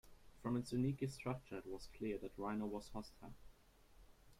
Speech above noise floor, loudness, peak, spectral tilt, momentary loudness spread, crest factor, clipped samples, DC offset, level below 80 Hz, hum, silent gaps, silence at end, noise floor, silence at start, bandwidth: 23 dB; -45 LUFS; -30 dBFS; -7 dB/octave; 12 LU; 16 dB; under 0.1%; under 0.1%; -64 dBFS; none; none; 0.05 s; -67 dBFS; 0.05 s; 16 kHz